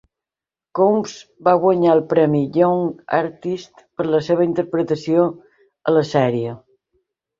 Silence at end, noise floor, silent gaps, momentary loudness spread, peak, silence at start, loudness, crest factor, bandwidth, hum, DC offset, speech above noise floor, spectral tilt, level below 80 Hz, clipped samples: 0.85 s; -90 dBFS; none; 12 LU; -2 dBFS; 0.75 s; -18 LUFS; 16 dB; 7.6 kHz; none; under 0.1%; 72 dB; -7.5 dB/octave; -62 dBFS; under 0.1%